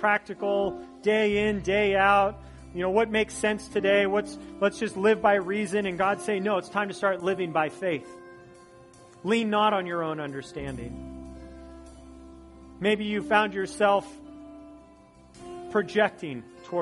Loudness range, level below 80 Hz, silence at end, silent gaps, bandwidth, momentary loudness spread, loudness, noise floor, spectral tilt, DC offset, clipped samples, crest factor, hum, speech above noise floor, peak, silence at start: 5 LU; -52 dBFS; 0 s; none; 11.5 kHz; 21 LU; -26 LUFS; -53 dBFS; -5 dB/octave; under 0.1%; under 0.1%; 20 dB; none; 28 dB; -6 dBFS; 0 s